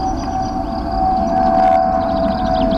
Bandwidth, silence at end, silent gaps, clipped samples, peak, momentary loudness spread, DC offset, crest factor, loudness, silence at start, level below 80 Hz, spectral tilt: 7.4 kHz; 0 s; none; under 0.1%; -6 dBFS; 8 LU; under 0.1%; 10 dB; -16 LUFS; 0 s; -28 dBFS; -7 dB/octave